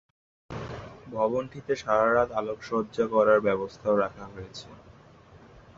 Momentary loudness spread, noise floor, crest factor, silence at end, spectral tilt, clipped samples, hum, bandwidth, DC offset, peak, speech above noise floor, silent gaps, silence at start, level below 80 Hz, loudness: 20 LU; -53 dBFS; 20 dB; 0.4 s; -6.5 dB/octave; under 0.1%; none; 7.6 kHz; under 0.1%; -8 dBFS; 26 dB; none; 0.5 s; -56 dBFS; -26 LUFS